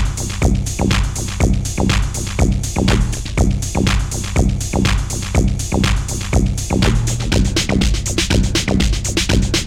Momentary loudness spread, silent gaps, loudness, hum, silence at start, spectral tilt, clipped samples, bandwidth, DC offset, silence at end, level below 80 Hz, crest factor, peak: 3 LU; none; -17 LUFS; none; 0 s; -4.5 dB/octave; under 0.1%; 16 kHz; under 0.1%; 0 s; -20 dBFS; 16 dB; 0 dBFS